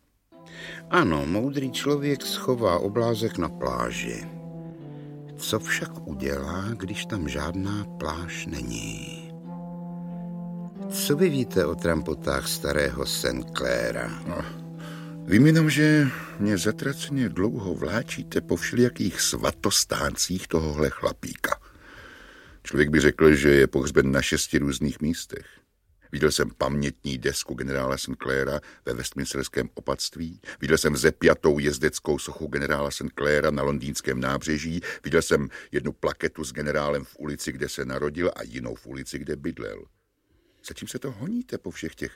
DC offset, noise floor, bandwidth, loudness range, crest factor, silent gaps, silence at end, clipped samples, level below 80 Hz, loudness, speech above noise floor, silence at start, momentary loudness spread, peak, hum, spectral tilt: under 0.1%; -67 dBFS; 16.5 kHz; 9 LU; 22 dB; none; 0 s; under 0.1%; -44 dBFS; -26 LUFS; 42 dB; 0.35 s; 16 LU; -4 dBFS; none; -4.5 dB/octave